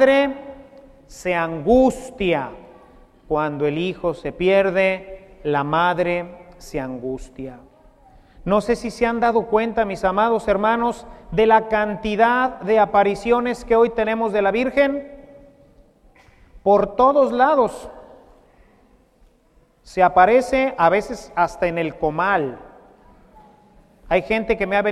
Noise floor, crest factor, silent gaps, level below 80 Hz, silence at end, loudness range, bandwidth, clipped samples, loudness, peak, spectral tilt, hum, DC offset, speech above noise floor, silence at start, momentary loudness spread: -57 dBFS; 20 dB; none; -44 dBFS; 0 s; 5 LU; 13 kHz; under 0.1%; -19 LUFS; -2 dBFS; -6 dB/octave; none; under 0.1%; 38 dB; 0 s; 14 LU